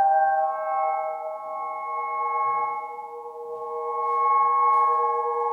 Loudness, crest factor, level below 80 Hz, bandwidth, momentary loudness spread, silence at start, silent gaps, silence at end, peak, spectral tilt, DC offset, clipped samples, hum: -24 LUFS; 12 dB; -80 dBFS; 3.3 kHz; 15 LU; 0 s; none; 0 s; -12 dBFS; -4 dB/octave; under 0.1%; under 0.1%; none